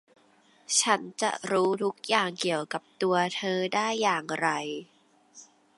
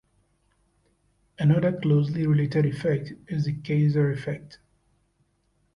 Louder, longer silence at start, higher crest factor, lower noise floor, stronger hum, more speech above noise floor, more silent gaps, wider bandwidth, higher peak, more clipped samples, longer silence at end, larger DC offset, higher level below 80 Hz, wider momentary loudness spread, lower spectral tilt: about the same, -27 LUFS vs -25 LUFS; second, 0.7 s vs 1.4 s; first, 22 dB vs 16 dB; second, -62 dBFS vs -69 dBFS; neither; second, 34 dB vs 46 dB; neither; first, 11.5 kHz vs 6.4 kHz; about the same, -8 dBFS vs -10 dBFS; neither; second, 0.35 s vs 1.2 s; neither; second, -82 dBFS vs -58 dBFS; second, 6 LU vs 10 LU; second, -2.5 dB/octave vs -9 dB/octave